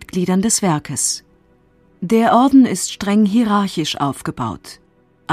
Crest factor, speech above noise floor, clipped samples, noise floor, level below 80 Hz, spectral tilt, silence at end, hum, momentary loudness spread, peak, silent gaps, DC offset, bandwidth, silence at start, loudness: 16 dB; 38 dB; under 0.1%; -54 dBFS; -50 dBFS; -4.5 dB/octave; 0 s; none; 14 LU; -2 dBFS; none; under 0.1%; 15.5 kHz; 0 s; -16 LUFS